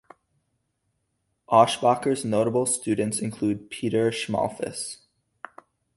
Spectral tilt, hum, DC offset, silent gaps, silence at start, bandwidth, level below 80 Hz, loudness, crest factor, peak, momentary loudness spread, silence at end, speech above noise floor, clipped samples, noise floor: -4.5 dB/octave; none; under 0.1%; none; 1.5 s; 12 kHz; -62 dBFS; -24 LUFS; 22 dB; -4 dBFS; 23 LU; 1 s; 52 dB; under 0.1%; -75 dBFS